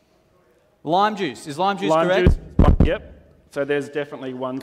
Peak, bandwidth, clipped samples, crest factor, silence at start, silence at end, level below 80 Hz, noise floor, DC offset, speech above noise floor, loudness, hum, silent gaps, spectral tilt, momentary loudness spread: 0 dBFS; 11.5 kHz; under 0.1%; 20 dB; 0.85 s; 0 s; -26 dBFS; -59 dBFS; under 0.1%; 38 dB; -21 LUFS; none; none; -7 dB/octave; 12 LU